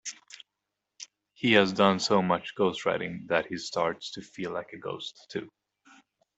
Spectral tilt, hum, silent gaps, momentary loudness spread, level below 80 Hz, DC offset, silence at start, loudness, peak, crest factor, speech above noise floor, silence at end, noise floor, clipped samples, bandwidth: -4.5 dB/octave; none; none; 24 LU; -68 dBFS; under 0.1%; 0.05 s; -28 LUFS; -4 dBFS; 26 dB; 57 dB; 0.9 s; -85 dBFS; under 0.1%; 8.2 kHz